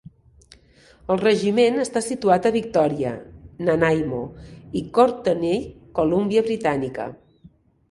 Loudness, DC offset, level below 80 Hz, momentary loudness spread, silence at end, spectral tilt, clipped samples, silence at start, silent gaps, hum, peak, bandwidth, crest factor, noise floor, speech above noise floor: -21 LUFS; under 0.1%; -52 dBFS; 12 LU; 0.75 s; -6 dB/octave; under 0.1%; 1.1 s; none; none; -2 dBFS; 11.5 kHz; 20 dB; -53 dBFS; 32 dB